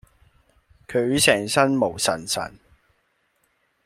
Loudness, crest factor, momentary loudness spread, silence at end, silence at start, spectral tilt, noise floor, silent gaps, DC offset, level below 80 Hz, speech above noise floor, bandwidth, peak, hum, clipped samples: -21 LUFS; 24 dB; 10 LU; 1.35 s; 0.9 s; -3 dB/octave; -68 dBFS; none; under 0.1%; -56 dBFS; 47 dB; 16.5 kHz; -2 dBFS; none; under 0.1%